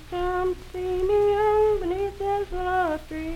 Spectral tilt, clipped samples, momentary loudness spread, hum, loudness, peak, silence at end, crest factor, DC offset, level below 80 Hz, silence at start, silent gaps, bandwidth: -6.5 dB/octave; under 0.1%; 8 LU; none; -25 LUFS; -12 dBFS; 0 s; 12 dB; under 0.1%; -38 dBFS; 0 s; none; 15 kHz